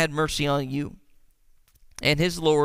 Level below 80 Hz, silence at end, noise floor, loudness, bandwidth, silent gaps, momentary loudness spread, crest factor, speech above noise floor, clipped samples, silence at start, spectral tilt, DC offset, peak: -46 dBFS; 0 s; -58 dBFS; -24 LUFS; 16 kHz; none; 12 LU; 20 dB; 35 dB; under 0.1%; 0 s; -5 dB/octave; under 0.1%; -4 dBFS